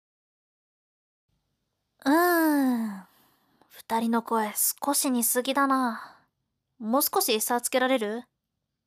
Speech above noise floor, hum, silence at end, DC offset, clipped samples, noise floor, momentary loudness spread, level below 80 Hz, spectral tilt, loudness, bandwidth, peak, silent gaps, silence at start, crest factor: 57 dB; none; 0.65 s; under 0.1%; under 0.1%; -82 dBFS; 11 LU; -80 dBFS; -2 dB/octave; -25 LUFS; 16 kHz; -12 dBFS; none; 2.05 s; 16 dB